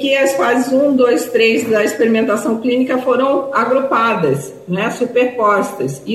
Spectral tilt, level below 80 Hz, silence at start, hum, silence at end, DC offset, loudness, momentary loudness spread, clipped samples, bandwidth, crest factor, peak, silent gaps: -5 dB/octave; -62 dBFS; 0 s; none; 0 s; under 0.1%; -15 LUFS; 6 LU; under 0.1%; 15 kHz; 12 dB; -2 dBFS; none